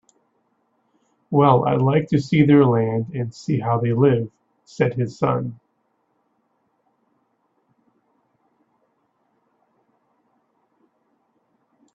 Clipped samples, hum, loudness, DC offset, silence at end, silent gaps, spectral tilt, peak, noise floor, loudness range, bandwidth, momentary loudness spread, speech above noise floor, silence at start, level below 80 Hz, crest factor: under 0.1%; none; -19 LUFS; under 0.1%; 6.4 s; none; -8.5 dB/octave; -2 dBFS; -69 dBFS; 11 LU; 7.8 kHz; 11 LU; 51 dB; 1.3 s; -60 dBFS; 22 dB